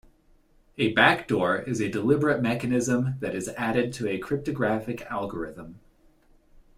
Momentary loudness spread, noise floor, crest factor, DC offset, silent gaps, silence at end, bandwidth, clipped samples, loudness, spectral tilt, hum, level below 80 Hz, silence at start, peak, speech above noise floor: 13 LU; -60 dBFS; 24 dB; under 0.1%; none; 1 s; 15 kHz; under 0.1%; -26 LUFS; -5.5 dB/octave; none; -56 dBFS; 0.8 s; -4 dBFS; 34 dB